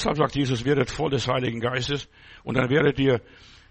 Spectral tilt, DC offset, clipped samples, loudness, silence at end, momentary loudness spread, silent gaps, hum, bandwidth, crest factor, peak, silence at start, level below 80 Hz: -6 dB/octave; under 0.1%; under 0.1%; -24 LUFS; 0.5 s; 8 LU; none; none; 8.6 kHz; 18 dB; -6 dBFS; 0 s; -46 dBFS